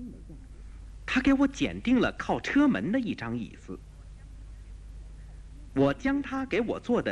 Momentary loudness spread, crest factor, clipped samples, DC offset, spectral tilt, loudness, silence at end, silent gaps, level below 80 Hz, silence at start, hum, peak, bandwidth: 24 LU; 16 dB; under 0.1%; under 0.1%; -6 dB/octave; -28 LUFS; 0 s; none; -46 dBFS; 0 s; none; -12 dBFS; 9.8 kHz